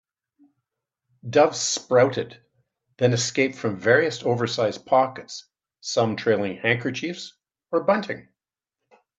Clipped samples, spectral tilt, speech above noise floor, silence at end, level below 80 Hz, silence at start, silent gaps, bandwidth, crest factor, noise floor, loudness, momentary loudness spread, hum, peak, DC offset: under 0.1%; -4 dB/octave; 64 dB; 1 s; -70 dBFS; 1.25 s; none; 8.4 kHz; 20 dB; -87 dBFS; -23 LUFS; 17 LU; none; -4 dBFS; under 0.1%